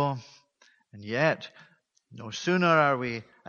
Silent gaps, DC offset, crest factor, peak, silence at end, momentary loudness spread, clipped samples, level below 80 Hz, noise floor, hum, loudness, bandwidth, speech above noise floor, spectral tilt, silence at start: none; under 0.1%; 22 dB; -8 dBFS; 0.25 s; 22 LU; under 0.1%; -70 dBFS; -64 dBFS; none; -26 LUFS; 7.2 kHz; 37 dB; -5.5 dB/octave; 0 s